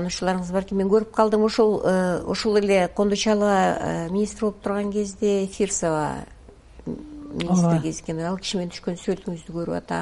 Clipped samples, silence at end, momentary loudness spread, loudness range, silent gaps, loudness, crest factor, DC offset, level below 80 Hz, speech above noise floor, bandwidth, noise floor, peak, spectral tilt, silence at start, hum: under 0.1%; 0 s; 11 LU; 6 LU; none; -23 LUFS; 18 dB; under 0.1%; -48 dBFS; 24 dB; 11.5 kHz; -46 dBFS; -4 dBFS; -5.5 dB/octave; 0 s; none